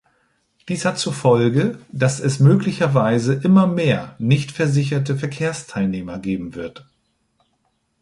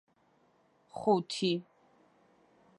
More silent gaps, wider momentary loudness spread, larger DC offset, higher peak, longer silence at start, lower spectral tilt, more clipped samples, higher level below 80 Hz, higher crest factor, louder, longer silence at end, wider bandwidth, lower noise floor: neither; about the same, 11 LU vs 9 LU; neither; first, -2 dBFS vs -14 dBFS; second, 0.65 s vs 0.95 s; about the same, -6.5 dB/octave vs -5.5 dB/octave; neither; first, -54 dBFS vs -78 dBFS; about the same, 18 dB vs 22 dB; first, -19 LUFS vs -32 LUFS; first, 1.3 s vs 1.15 s; about the same, 11.5 kHz vs 11 kHz; about the same, -68 dBFS vs -69 dBFS